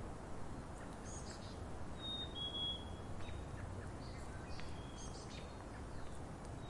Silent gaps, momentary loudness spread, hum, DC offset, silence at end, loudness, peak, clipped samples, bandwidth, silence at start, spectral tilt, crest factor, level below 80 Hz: none; 9 LU; none; under 0.1%; 0 s; -48 LUFS; -30 dBFS; under 0.1%; 11.5 kHz; 0 s; -4.5 dB/octave; 16 dB; -54 dBFS